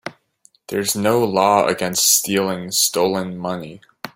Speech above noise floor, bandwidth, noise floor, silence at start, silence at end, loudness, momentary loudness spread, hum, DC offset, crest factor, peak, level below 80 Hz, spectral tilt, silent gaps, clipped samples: 38 dB; 16.5 kHz; -57 dBFS; 0.05 s; 0.05 s; -17 LUFS; 15 LU; none; under 0.1%; 18 dB; -2 dBFS; -60 dBFS; -2.5 dB/octave; none; under 0.1%